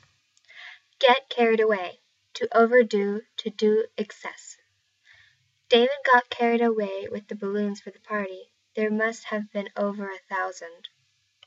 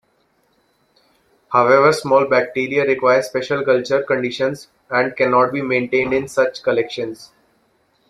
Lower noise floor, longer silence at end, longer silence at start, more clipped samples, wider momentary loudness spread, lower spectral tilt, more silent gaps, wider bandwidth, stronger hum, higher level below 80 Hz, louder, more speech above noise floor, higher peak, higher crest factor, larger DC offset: first, -70 dBFS vs -62 dBFS; second, 0.7 s vs 0.85 s; second, 0.55 s vs 1.5 s; neither; first, 21 LU vs 9 LU; about the same, -4.5 dB/octave vs -5 dB/octave; neither; second, 7.8 kHz vs 13 kHz; neither; second, -82 dBFS vs -58 dBFS; second, -24 LUFS vs -17 LUFS; about the same, 45 dB vs 45 dB; second, -6 dBFS vs -2 dBFS; about the same, 20 dB vs 18 dB; neither